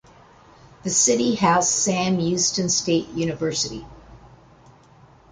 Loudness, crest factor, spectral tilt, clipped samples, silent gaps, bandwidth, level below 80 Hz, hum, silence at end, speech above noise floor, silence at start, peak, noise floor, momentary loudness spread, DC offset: -20 LUFS; 18 dB; -3 dB/octave; under 0.1%; none; 10 kHz; -54 dBFS; none; 1.05 s; 30 dB; 0.85 s; -6 dBFS; -51 dBFS; 9 LU; under 0.1%